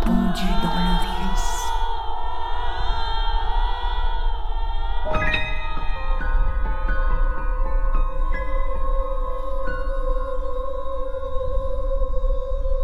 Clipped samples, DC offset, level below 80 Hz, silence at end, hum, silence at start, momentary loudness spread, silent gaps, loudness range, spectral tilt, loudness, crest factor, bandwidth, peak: under 0.1%; under 0.1%; -22 dBFS; 0 s; none; 0 s; 7 LU; none; 3 LU; -5.5 dB/octave; -27 LUFS; 14 dB; 9 kHz; -6 dBFS